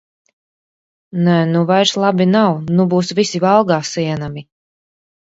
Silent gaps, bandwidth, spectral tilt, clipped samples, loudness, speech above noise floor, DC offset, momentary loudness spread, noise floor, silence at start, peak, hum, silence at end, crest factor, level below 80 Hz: none; 8 kHz; -6 dB/octave; under 0.1%; -15 LUFS; over 76 dB; under 0.1%; 10 LU; under -90 dBFS; 1.15 s; 0 dBFS; none; 0.8 s; 16 dB; -56 dBFS